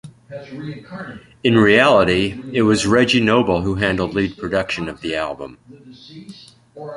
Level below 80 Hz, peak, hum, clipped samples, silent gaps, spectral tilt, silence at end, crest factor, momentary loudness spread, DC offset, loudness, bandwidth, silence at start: -44 dBFS; -2 dBFS; none; under 0.1%; none; -5.5 dB/octave; 0 s; 18 dB; 23 LU; under 0.1%; -17 LUFS; 11.5 kHz; 0.05 s